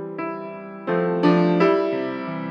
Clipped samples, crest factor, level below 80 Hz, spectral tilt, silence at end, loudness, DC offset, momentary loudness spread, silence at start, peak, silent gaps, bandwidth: under 0.1%; 16 dB; -78 dBFS; -8.5 dB/octave; 0 s; -21 LUFS; under 0.1%; 14 LU; 0 s; -4 dBFS; none; 6.4 kHz